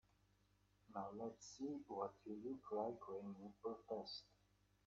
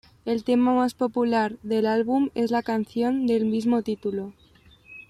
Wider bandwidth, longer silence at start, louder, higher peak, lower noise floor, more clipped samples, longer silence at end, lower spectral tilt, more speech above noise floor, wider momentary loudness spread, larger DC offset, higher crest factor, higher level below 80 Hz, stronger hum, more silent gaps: second, 7.4 kHz vs 13 kHz; first, 0.9 s vs 0.25 s; second, -51 LUFS vs -24 LUFS; second, -32 dBFS vs -12 dBFS; first, -79 dBFS vs -53 dBFS; neither; first, 0.6 s vs 0.1 s; about the same, -5.5 dB/octave vs -6.5 dB/octave; about the same, 29 dB vs 30 dB; about the same, 7 LU vs 7 LU; neither; first, 20 dB vs 12 dB; second, -82 dBFS vs -62 dBFS; first, 50 Hz at -70 dBFS vs none; neither